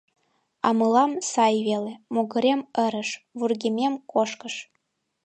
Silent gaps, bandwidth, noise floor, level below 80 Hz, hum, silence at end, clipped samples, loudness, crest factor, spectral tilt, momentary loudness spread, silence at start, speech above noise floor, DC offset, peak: none; 9 kHz; -75 dBFS; -78 dBFS; none; 0.6 s; under 0.1%; -24 LUFS; 18 dB; -4 dB/octave; 10 LU; 0.65 s; 51 dB; under 0.1%; -6 dBFS